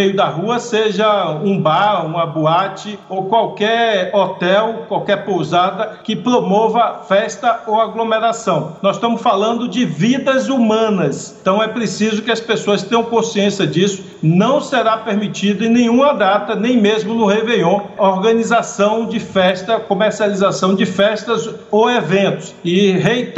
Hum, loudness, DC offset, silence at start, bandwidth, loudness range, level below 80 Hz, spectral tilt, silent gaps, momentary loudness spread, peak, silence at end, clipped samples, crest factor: none; -15 LUFS; under 0.1%; 0 s; 8.2 kHz; 2 LU; -60 dBFS; -5.5 dB/octave; none; 5 LU; 0 dBFS; 0 s; under 0.1%; 14 dB